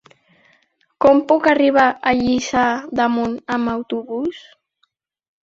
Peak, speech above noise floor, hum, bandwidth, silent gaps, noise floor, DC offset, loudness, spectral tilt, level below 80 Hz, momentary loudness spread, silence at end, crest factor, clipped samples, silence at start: -2 dBFS; 50 dB; none; 7.8 kHz; none; -67 dBFS; under 0.1%; -17 LUFS; -4.5 dB/octave; -52 dBFS; 11 LU; 1.05 s; 18 dB; under 0.1%; 1 s